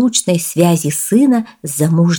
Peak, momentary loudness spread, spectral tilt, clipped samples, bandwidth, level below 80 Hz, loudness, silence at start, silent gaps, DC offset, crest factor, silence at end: 0 dBFS; 6 LU; -5 dB/octave; under 0.1%; 19.5 kHz; -60 dBFS; -14 LUFS; 0 s; none; under 0.1%; 14 dB; 0 s